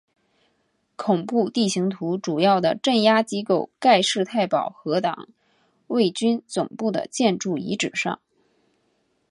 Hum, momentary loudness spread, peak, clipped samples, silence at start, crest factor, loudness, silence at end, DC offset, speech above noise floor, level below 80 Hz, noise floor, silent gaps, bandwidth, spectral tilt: none; 9 LU; -4 dBFS; under 0.1%; 1 s; 20 dB; -22 LUFS; 1.15 s; under 0.1%; 48 dB; -70 dBFS; -69 dBFS; none; 11.5 kHz; -4.5 dB/octave